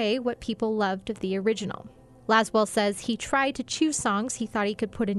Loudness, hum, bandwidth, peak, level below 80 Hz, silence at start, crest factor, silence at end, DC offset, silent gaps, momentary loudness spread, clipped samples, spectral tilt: -27 LUFS; none; 12 kHz; -8 dBFS; -56 dBFS; 0 s; 20 dB; 0 s; under 0.1%; none; 7 LU; under 0.1%; -4 dB/octave